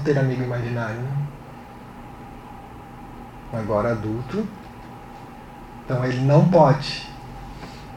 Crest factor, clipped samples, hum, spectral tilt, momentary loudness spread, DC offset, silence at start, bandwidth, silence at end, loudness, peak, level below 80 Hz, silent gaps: 22 dB; under 0.1%; none; -8 dB/octave; 23 LU; under 0.1%; 0 s; 10 kHz; 0 s; -22 LUFS; -2 dBFS; -46 dBFS; none